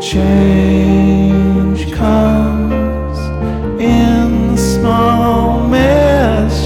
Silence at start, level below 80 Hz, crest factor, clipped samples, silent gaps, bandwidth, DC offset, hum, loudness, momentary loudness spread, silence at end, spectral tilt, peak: 0 s; -20 dBFS; 10 dB; under 0.1%; none; 15.5 kHz; under 0.1%; none; -12 LUFS; 7 LU; 0 s; -7 dB/octave; -2 dBFS